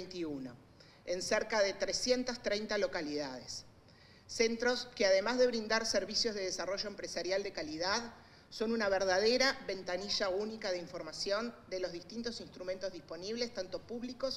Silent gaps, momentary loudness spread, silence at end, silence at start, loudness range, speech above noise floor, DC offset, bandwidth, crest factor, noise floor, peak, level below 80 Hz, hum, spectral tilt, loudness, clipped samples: none; 13 LU; 0 s; 0 s; 6 LU; 25 dB; under 0.1%; 15 kHz; 20 dB; -60 dBFS; -16 dBFS; -62 dBFS; none; -2.5 dB/octave; -35 LUFS; under 0.1%